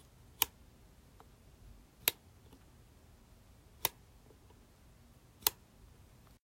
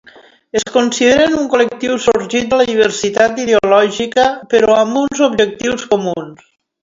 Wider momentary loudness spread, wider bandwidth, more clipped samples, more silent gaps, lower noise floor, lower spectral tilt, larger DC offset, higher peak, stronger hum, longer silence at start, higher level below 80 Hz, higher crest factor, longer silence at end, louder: first, 27 LU vs 6 LU; first, 16 kHz vs 7.8 kHz; neither; neither; first, -62 dBFS vs -43 dBFS; second, -0.5 dB/octave vs -3.5 dB/octave; neither; second, -6 dBFS vs 0 dBFS; neither; second, 0.4 s vs 0.55 s; second, -64 dBFS vs -48 dBFS; first, 38 dB vs 14 dB; first, 0.9 s vs 0.5 s; second, -36 LUFS vs -13 LUFS